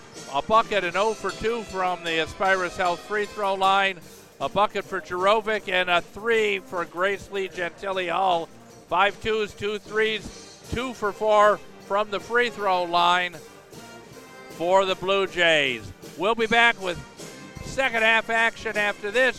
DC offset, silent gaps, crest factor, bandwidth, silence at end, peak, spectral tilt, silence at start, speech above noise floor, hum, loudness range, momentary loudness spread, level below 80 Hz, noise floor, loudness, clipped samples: under 0.1%; none; 20 dB; 15.5 kHz; 0 s; -4 dBFS; -3.5 dB/octave; 0 s; 20 dB; none; 3 LU; 14 LU; -52 dBFS; -44 dBFS; -23 LUFS; under 0.1%